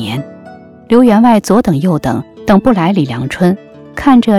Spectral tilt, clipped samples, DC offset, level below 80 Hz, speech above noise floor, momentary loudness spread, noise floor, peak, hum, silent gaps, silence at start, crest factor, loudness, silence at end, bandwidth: -7 dB/octave; under 0.1%; under 0.1%; -38 dBFS; 25 dB; 13 LU; -34 dBFS; 0 dBFS; none; none; 0 s; 10 dB; -11 LUFS; 0 s; 13 kHz